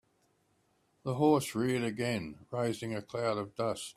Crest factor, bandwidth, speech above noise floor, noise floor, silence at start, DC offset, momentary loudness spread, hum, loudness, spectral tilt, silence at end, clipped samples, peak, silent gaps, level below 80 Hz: 20 dB; 15.5 kHz; 41 dB; -73 dBFS; 1.05 s; under 0.1%; 10 LU; none; -33 LUFS; -5.5 dB/octave; 0.05 s; under 0.1%; -14 dBFS; none; -70 dBFS